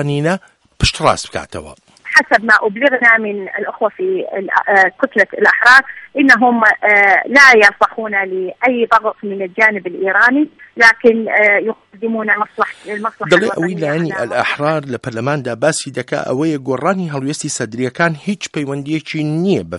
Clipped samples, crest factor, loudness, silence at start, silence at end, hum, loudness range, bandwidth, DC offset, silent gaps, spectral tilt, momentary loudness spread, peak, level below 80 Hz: 0.2%; 14 dB; -13 LUFS; 0 s; 0 s; none; 9 LU; 13.5 kHz; under 0.1%; none; -4.5 dB/octave; 13 LU; 0 dBFS; -40 dBFS